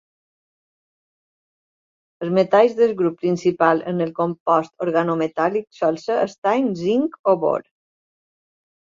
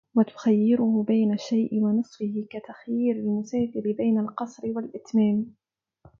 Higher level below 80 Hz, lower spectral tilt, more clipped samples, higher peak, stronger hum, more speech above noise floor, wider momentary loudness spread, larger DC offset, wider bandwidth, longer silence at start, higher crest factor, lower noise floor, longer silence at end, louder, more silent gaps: about the same, -68 dBFS vs -68 dBFS; about the same, -7 dB/octave vs -8 dB/octave; neither; first, -2 dBFS vs -8 dBFS; neither; first, over 71 dB vs 34 dB; second, 6 LU vs 10 LU; neither; about the same, 7.6 kHz vs 7 kHz; first, 2.2 s vs 0.15 s; about the same, 20 dB vs 16 dB; first, under -90 dBFS vs -58 dBFS; first, 1.2 s vs 0.7 s; first, -20 LUFS vs -25 LUFS; first, 4.40-4.46 s, 6.38-6.42 s, 7.19-7.24 s vs none